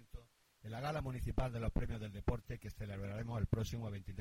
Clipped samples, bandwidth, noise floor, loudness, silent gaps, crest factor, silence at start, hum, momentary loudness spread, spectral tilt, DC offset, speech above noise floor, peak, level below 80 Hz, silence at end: under 0.1%; 16 kHz; -61 dBFS; -42 LUFS; none; 20 dB; 0 s; none; 10 LU; -7 dB/octave; under 0.1%; 21 dB; -20 dBFS; -48 dBFS; 0 s